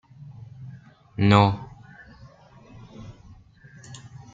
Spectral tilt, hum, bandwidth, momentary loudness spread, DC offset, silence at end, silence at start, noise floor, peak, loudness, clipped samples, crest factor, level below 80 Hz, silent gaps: -7 dB/octave; none; 7.8 kHz; 28 LU; under 0.1%; 0.35 s; 0.6 s; -50 dBFS; -2 dBFS; -20 LUFS; under 0.1%; 24 dB; -54 dBFS; none